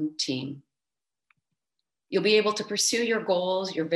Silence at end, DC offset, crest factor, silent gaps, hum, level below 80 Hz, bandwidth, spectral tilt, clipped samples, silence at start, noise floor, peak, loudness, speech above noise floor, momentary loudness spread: 0 s; under 0.1%; 20 dB; none; none; -78 dBFS; 13 kHz; -3 dB/octave; under 0.1%; 0 s; under -90 dBFS; -8 dBFS; -25 LUFS; over 64 dB; 10 LU